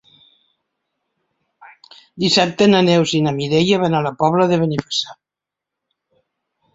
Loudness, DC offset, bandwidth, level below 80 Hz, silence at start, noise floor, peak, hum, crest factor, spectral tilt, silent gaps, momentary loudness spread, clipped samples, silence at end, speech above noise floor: -16 LUFS; under 0.1%; 8 kHz; -56 dBFS; 2.15 s; -86 dBFS; -2 dBFS; none; 18 dB; -5.5 dB/octave; none; 8 LU; under 0.1%; 1.6 s; 70 dB